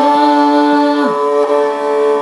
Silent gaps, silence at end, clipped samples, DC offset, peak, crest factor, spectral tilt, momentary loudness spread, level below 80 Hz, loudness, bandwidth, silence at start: none; 0 s; under 0.1%; under 0.1%; 0 dBFS; 12 dB; -4.5 dB/octave; 4 LU; -82 dBFS; -12 LUFS; 11.5 kHz; 0 s